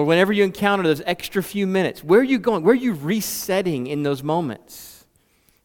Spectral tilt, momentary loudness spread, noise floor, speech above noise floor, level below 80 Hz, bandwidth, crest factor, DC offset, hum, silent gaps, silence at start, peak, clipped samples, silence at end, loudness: -5.5 dB/octave; 8 LU; -61 dBFS; 41 dB; -58 dBFS; 18 kHz; 18 dB; under 0.1%; none; none; 0 s; -2 dBFS; under 0.1%; 0.75 s; -20 LUFS